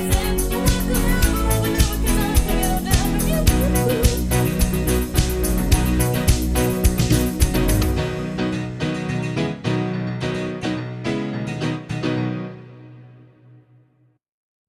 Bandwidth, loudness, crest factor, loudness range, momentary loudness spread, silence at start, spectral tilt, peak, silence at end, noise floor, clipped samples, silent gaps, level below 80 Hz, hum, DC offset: 16 kHz; -21 LUFS; 18 dB; 7 LU; 7 LU; 0 s; -5 dB/octave; -2 dBFS; 1.55 s; -59 dBFS; under 0.1%; none; -24 dBFS; none; under 0.1%